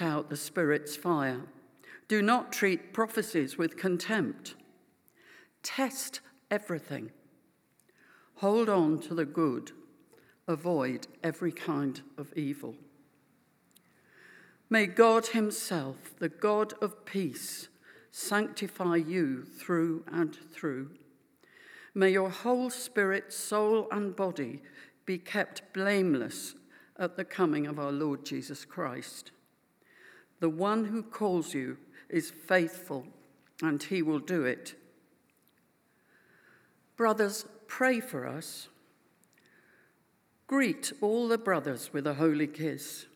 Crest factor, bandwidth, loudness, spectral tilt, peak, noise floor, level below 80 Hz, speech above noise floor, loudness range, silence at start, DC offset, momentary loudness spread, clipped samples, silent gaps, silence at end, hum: 24 dB; 20 kHz; -31 LUFS; -5 dB/octave; -10 dBFS; -70 dBFS; under -90 dBFS; 39 dB; 6 LU; 0 s; under 0.1%; 14 LU; under 0.1%; none; 0.1 s; none